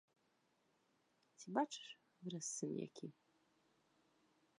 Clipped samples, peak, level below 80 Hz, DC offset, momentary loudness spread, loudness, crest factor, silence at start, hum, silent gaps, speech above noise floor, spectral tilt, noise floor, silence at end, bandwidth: under 0.1%; -24 dBFS; under -90 dBFS; under 0.1%; 15 LU; -46 LUFS; 28 dB; 1.4 s; none; none; 35 dB; -4 dB/octave; -81 dBFS; 1.5 s; 11 kHz